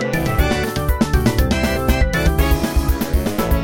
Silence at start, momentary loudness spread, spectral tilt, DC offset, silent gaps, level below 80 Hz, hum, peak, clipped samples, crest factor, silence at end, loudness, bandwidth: 0 s; 3 LU; -5.5 dB/octave; under 0.1%; none; -20 dBFS; none; -2 dBFS; under 0.1%; 14 dB; 0 s; -18 LUFS; 17.5 kHz